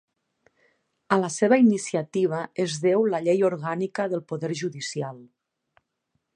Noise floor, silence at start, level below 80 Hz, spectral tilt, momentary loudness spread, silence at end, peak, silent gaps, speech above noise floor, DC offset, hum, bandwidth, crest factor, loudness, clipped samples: -77 dBFS; 1.1 s; -76 dBFS; -5.5 dB/octave; 11 LU; 1.1 s; -4 dBFS; none; 53 dB; under 0.1%; none; 11 kHz; 22 dB; -24 LUFS; under 0.1%